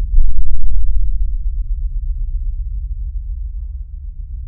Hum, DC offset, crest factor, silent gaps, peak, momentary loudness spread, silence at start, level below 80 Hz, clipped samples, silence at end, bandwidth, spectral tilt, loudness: none; under 0.1%; 10 dB; none; 0 dBFS; 9 LU; 0 s; -16 dBFS; under 0.1%; 0 s; 0.2 kHz; -18.5 dB/octave; -25 LUFS